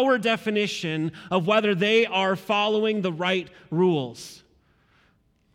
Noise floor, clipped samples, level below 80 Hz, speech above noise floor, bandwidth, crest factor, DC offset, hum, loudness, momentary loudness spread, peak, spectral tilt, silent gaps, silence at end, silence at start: -64 dBFS; under 0.1%; -68 dBFS; 41 dB; 15.5 kHz; 16 dB; under 0.1%; none; -23 LUFS; 9 LU; -8 dBFS; -5.5 dB/octave; none; 1.2 s; 0 s